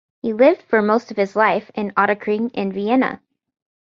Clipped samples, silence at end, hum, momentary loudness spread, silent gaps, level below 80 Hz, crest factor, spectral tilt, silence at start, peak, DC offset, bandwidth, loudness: under 0.1%; 0.7 s; none; 8 LU; none; -64 dBFS; 18 dB; -7 dB/octave; 0.25 s; -2 dBFS; under 0.1%; 7.4 kHz; -19 LUFS